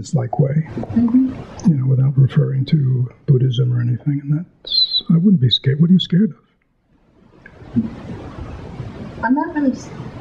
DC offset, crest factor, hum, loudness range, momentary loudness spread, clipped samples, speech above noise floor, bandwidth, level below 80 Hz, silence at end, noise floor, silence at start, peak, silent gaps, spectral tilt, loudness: under 0.1%; 14 dB; none; 8 LU; 18 LU; under 0.1%; 43 dB; 8 kHz; -46 dBFS; 0 s; -59 dBFS; 0 s; -4 dBFS; none; -7.5 dB/octave; -17 LUFS